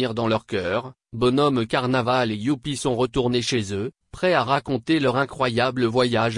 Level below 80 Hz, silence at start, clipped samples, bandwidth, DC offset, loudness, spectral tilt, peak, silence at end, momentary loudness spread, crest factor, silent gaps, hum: -50 dBFS; 0 s; under 0.1%; 11 kHz; under 0.1%; -22 LUFS; -5.5 dB/octave; -6 dBFS; 0 s; 5 LU; 16 dB; none; none